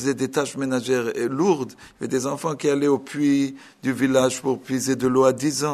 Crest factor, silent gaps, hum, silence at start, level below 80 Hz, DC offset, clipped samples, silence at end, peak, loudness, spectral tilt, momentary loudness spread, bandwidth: 18 dB; none; none; 0 s; -62 dBFS; under 0.1%; under 0.1%; 0 s; -4 dBFS; -22 LUFS; -5 dB/octave; 8 LU; 13.5 kHz